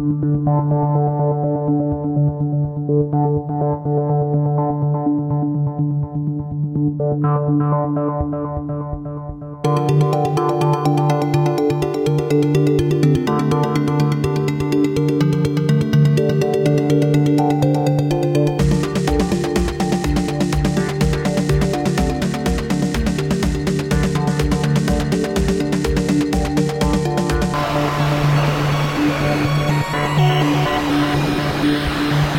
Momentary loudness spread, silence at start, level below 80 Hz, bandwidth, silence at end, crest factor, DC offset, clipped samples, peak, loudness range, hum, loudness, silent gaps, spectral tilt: 4 LU; 0 s; -32 dBFS; 16 kHz; 0 s; 12 dB; under 0.1%; under 0.1%; -6 dBFS; 3 LU; none; -18 LUFS; none; -7 dB/octave